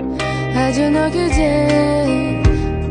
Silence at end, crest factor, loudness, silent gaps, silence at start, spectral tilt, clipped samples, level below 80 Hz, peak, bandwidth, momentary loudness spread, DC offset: 0 s; 14 dB; -16 LUFS; none; 0 s; -6.5 dB/octave; under 0.1%; -24 dBFS; -2 dBFS; 10 kHz; 5 LU; under 0.1%